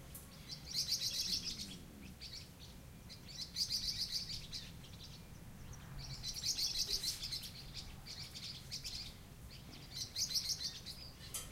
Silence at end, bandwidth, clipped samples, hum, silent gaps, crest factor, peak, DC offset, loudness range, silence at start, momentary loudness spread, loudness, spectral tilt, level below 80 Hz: 0 s; 16 kHz; under 0.1%; none; none; 20 dB; -24 dBFS; under 0.1%; 2 LU; 0 s; 18 LU; -41 LUFS; -1 dB/octave; -58 dBFS